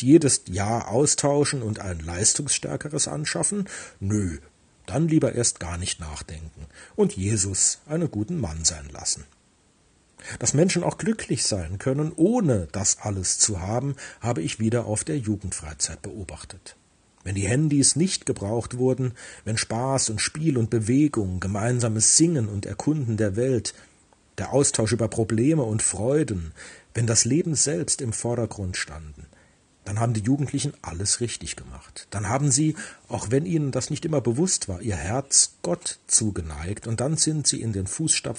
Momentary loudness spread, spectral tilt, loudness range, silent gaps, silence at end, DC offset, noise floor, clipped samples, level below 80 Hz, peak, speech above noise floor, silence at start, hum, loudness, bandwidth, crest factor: 13 LU; -4 dB/octave; 5 LU; none; 0 s; under 0.1%; -61 dBFS; under 0.1%; -50 dBFS; -4 dBFS; 37 dB; 0 s; none; -24 LUFS; 10 kHz; 20 dB